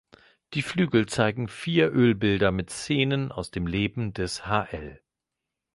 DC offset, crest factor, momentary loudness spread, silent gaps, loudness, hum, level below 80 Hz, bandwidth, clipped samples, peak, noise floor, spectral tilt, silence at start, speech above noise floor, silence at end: under 0.1%; 20 dB; 10 LU; none; -26 LUFS; none; -48 dBFS; 11.5 kHz; under 0.1%; -6 dBFS; -86 dBFS; -6 dB/octave; 0.5 s; 61 dB; 0.8 s